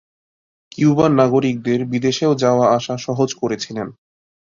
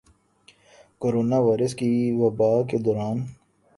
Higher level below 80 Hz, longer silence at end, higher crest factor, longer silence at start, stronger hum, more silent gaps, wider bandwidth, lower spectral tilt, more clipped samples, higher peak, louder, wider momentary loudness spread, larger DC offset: about the same, -56 dBFS vs -60 dBFS; about the same, 0.55 s vs 0.45 s; about the same, 16 dB vs 16 dB; second, 0.8 s vs 1 s; neither; neither; second, 7.6 kHz vs 11.5 kHz; second, -6 dB/octave vs -8 dB/octave; neither; first, -2 dBFS vs -8 dBFS; first, -17 LUFS vs -23 LUFS; first, 12 LU vs 8 LU; neither